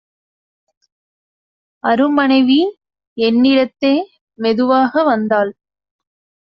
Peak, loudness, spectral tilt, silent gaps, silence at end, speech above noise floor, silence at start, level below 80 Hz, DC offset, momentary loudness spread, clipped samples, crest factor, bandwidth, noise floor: -2 dBFS; -15 LUFS; -2.5 dB/octave; 3.07-3.16 s, 4.21-4.27 s; 0.95 s; over 77 dB; 1.85 s; -60 dBFS; under 0.1%; 10 LU; under 0.1%; 14 dB; 5.8 kHz; under -90 dBFS